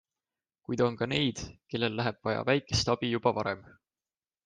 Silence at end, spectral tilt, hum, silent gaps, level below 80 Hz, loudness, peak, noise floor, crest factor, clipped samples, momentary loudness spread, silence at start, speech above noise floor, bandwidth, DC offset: 0.85 s; -5 dB/octave; none; none; -58 dBFS; -30 LUFS; -10 dBFS; under -90 dBFS; 22 dB; under 0.1%; 10 LU; 0.7 s; over 60 dB; 9.8 kHz; under 0.1%